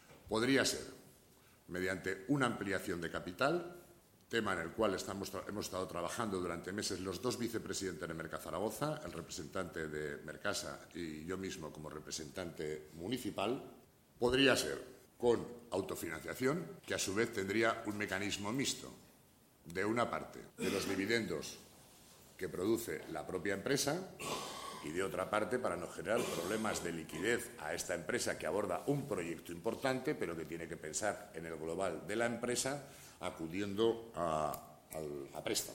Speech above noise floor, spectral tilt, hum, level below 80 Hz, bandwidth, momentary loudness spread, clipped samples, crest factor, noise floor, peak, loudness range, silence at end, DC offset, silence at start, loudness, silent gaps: 28 dB; -4 dB/octave; none; -66 dBFS; 16.5 kHz; 10 LU; under 0.1%; 24 dB; -66 dBFS; -16 dBFS; 5 LU; 0 s; under 0.1%; 0.1 s; -39 LUFS; none